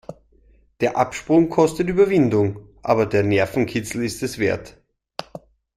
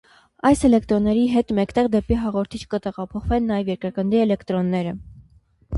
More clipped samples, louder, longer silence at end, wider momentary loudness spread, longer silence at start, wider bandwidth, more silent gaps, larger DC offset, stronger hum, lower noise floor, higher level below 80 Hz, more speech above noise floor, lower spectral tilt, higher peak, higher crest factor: neither; about the same, -20 LUFS vs -21 LUFS; first, 0.4 s vs 0 s; first, 18 LU vs 10 LU; second, 0.1 s vs 0.45 s; first, 15 kHz vs 11.5 kHz; neither; neither; neither; about the same, -55 dBFS vs -55 dBFS; second, -50 dBFS vs -38 dBFS; about the same, 36 dB vs 35 dB; about the same, -6.5 dB/octave vs -7 dB/octave; about the same, -2 dBFS vs -4 dBFS; about the same, 18 dB vs 16 dB